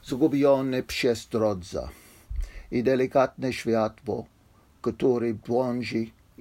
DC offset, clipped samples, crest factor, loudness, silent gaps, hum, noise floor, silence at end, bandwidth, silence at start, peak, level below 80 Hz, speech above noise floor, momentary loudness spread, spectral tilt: under 0.1%; under 0.1%; 16 dB; -26 LUFS; none; none; -58 dBFS; 0.3 s; 16 kHz; 0.05 s; -10 dBFS; -44 dBFS; 33 dB; 14 LU; -6 dB/octave